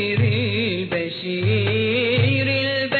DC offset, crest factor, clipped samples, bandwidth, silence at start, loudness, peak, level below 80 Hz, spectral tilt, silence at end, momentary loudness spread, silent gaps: under 0.1%; 14 dB; under 0.1%; 4.6 kHz; 0 s; -20 LUFS; -6 dBFS; -52 dBFS; -8.5 dB/octave; 0 s; 6 LU; none